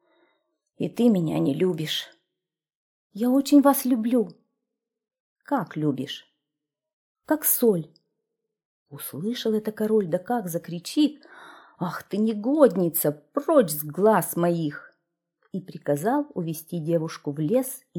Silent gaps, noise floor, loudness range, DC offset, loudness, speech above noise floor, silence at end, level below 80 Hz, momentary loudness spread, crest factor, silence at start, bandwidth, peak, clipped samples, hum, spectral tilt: 2.75-3.10 s, 5.20-5.36 s, 6.93-7.15 s, 8.65-8.86 s; -86 dBFS; 5 LU; under 0.1%; -24 LUFS; 62 dB; 0 s; -74 dBFS; 13 LU; 20 dB; 0.8 s; 19.5 kHz; -4 dBFS; under 0.1%; none; -5.5 dB/octave